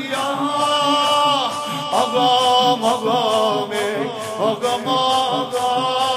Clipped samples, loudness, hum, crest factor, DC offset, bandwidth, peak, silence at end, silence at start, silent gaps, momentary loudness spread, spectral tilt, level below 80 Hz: under 0.1%; -18 LUFS; none; 16 dB; under 0.1%; 15.5 kHz; -2 dBFS; 0 s; 0 s; none; 7 LU; -3 dB/octave; -70 dBFS